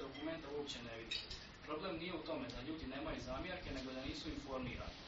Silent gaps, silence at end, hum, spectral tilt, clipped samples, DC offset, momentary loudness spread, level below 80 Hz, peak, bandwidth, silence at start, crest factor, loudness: none; 0 s; none; -3.5 dB/octave; under 0.1%; under 0.1%; 3 LU; -58 dBFS; -28 dBFS; 7.6 kHz; 0 s; 18 dB; -46 LUFS